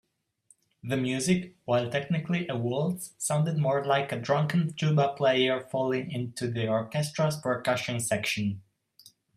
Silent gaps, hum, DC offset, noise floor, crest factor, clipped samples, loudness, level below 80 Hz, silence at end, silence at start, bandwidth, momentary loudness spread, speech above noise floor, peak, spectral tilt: none; none; under 0.1%; -65 dBFS; 18 dB; under 0.1%; -28 LUFS; -66 dBFS; 0.75 s; 0.85 s; 15 kHz; 7 LU; 37 dB; -10 dBFS; -5 dB/octave